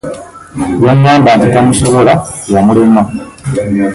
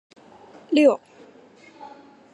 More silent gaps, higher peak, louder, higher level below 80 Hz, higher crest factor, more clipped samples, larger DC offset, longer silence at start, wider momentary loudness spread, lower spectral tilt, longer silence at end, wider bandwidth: neither; first, 0 dBFS vs -6 dBFS; first, -9 LUFS vs -20 LUFS; first, -34 dBFS vs -80 dBFS; second, 8 dB vs 20 dB; neither; neither; second, 0.05 s vs 0.7 s; second, 14 LU vs 26 LU; first, -6 dB/octave vs -4.5 dB/octave; second, 0 s vs 1.4 s; about the same, 11.5 kHz vs 11 kHz